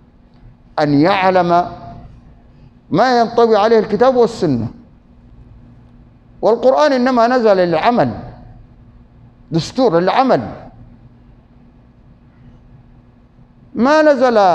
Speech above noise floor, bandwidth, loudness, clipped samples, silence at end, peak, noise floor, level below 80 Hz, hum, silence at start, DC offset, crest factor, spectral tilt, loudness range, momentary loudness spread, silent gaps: 33 dB; 8.8 kHz; -13 LUFS; under 0.1%; 0 s; 0 dBFS; -46 dBFS; -46 dBFS; none; 0.75 s; under 0.1%; 16 dB; -6.5 dB/octave; 5 LU; 15 LU; none